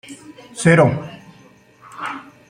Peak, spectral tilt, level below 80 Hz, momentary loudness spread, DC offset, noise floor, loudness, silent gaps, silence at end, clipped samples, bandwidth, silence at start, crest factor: -2 dBFS; -6 dB/octave; -56 dBFS; 24 LU; under 0.1%; -49 dBFS; -17 LUFS; none; 0.3 s; under 0.1%; 10.5 kHz; 0.1 s; 20 dB